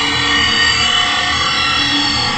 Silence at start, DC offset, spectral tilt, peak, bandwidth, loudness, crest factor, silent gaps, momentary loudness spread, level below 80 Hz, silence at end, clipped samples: 0 s; under 0.1%; -1.5 dB/octave; 0 dBFS; 11.5 kHz; -12 LUFS; 14 dB; none; 3 LU; -36 dBFS; 0 s; under 0.1%